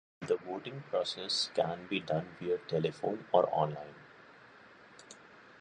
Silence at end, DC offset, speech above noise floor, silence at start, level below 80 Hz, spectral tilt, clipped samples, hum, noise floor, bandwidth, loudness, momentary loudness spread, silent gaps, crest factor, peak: 0.05 s; under 0.1%; 23 dB; 0.2 s; -72 dBFS; -4.5 dB/octave; under 0.1%; none; -57 dBFS; 10.5 kHz; -34 LUFS; 23 LU; none; 24 dB; -12 dBFS